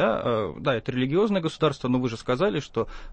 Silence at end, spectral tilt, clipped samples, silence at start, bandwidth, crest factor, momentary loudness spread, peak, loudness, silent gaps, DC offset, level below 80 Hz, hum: 0 s; -6.5 dB/octave; under 0.1%; 0 s; 8.8 kHz; 14 dB; 5 LU; -10 dBFS; -25 LUFS; none; under 0.1%; -48 dBFS; none